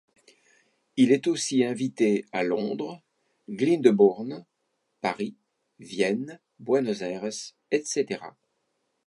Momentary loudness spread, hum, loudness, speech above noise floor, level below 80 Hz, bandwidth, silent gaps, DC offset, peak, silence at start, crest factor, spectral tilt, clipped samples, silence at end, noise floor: 16 LU; none; -26 LUFS; 52 dB; -76 dBFS; 11.5 kHz; none; under 0.1%; -4 dBFS; 0.95 s; 22 dB; -5 dB/octave; under 0.1%; 0.75 s; -77 dBFS